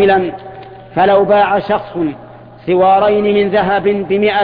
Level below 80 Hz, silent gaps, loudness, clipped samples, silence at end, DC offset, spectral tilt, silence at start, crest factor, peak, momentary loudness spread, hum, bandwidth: -46 dBFS; none; -13 LUFS; under 0.1%; 0 s; under 0.1%; -9 dB/octave; 0 s; 12 dB; 0 dBFS; 18 LU; none; 5 kHz